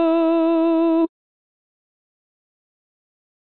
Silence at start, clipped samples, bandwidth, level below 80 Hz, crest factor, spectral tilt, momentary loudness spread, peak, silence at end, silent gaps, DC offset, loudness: 0 s; under 0.1%; 4.2 kHz; -76 dBFS; 12 dB; -7.5 dB/octave; 4 LU; -10 dBFS; 2.35 s; none; 0.5%; -18 LUFS